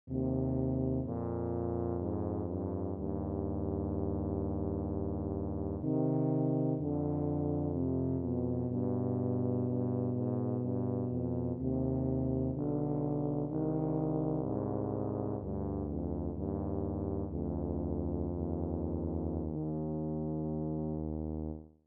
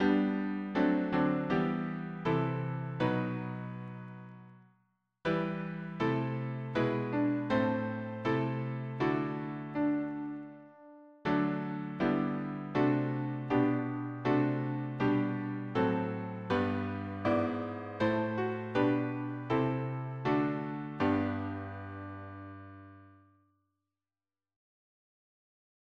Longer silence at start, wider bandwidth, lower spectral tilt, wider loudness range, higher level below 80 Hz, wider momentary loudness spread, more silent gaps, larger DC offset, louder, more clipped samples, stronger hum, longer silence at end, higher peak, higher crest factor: about the same, 0.05 s vs 0 s; second, 2.1 kHz vs 6.8 kHz; first, -14.5 dB/octave vs -9 dB/octave; about the same, 3 LU vs 5 LU; first, -48 dBFS vs -66 dBFS; second, 4 LU vs 12 LU; neither; neither; about the same, -35 LUFS vs -33 LUFS; neither; neither; second, 0.2 s vs 2.9 s; second, -20 dBFS vs -16 dBFS; about the same, 14 dB vs 18 dB